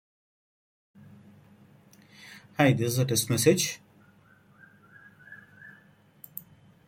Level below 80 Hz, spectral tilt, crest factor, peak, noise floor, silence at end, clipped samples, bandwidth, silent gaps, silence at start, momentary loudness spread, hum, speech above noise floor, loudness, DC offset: -66 dBFS; -4.5 dB/octave; 24 dB; -8 dBFS; -59 dBFS; 0.45 s; under 0.1%; 16.5 kHz; none; 2.25 s; 27 LU; none; 35 dB; -25 LUFS; under 0.1%